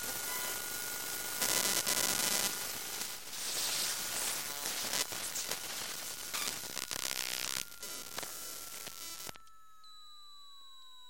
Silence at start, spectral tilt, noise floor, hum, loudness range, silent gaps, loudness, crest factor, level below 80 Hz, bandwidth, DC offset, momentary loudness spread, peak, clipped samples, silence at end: 0 s; 0.5 dB/octave; -60 dBFS; none; 8 LU; none; -35 LUFS; 28 dB; -70 dBFS; 17 kHz; 0.2%; 17 LU; -10 dBFS; under 0.1%; 0 s